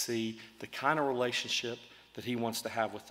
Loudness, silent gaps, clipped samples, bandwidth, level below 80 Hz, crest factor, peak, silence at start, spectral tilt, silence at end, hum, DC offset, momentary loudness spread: -34 LUFS; none; under 0.1%; 16 kHz; -76 dBFS; 22 dB; -14 dBFS; 0 s; -3.5 dB/octave; 0 s; none; under 0.1%; 14 LU